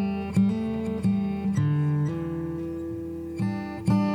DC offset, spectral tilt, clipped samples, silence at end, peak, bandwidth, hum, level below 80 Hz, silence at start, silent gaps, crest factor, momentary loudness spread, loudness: under 0.1%; -8.5 dB/octave; under 0.1%; 0 s; -12 dBFS; 10 kHz; none; -50 dBFS; 0 s; none; 14 dB; 9 LU; -27 LUFS